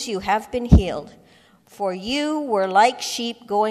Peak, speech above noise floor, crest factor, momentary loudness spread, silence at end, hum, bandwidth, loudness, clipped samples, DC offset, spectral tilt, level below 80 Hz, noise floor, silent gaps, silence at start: -2 dBFS; 33 dB; 20 dB; 11 LU; 0 s; none; 14 kHz; -21 LUFS; under 0.1%; under 0.1%; -5.5 dB/octave; -28 dBFS; -54 dBFS; none; 0 s